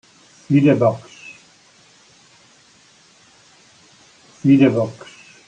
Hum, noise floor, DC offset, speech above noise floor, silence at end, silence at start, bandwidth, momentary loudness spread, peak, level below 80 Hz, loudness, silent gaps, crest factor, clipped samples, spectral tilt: none; -52 dBFS; under 0.1%; 37 dB; 0.55 s; 0.5 s; 8.8 kHz; 26 LU; -2 dBFS; -62 dBFS; -16 LUFS; none; 18 dB; under 0.1%; -8 dB/octave